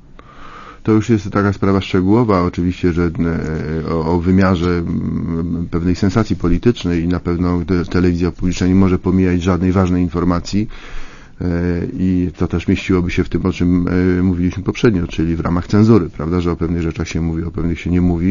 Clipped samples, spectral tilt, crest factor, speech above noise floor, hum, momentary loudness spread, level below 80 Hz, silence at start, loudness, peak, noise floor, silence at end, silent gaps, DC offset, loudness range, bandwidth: under 0.1%; -8 dB/octave; 16 dB; 21 dB; none; 7 LU; -30 dBFS; 0.15 s; -16 LUFS; 0 dBFS; -36 dBFS; 0 s; none; under 0.1%; 2 LU; 7.4 kHz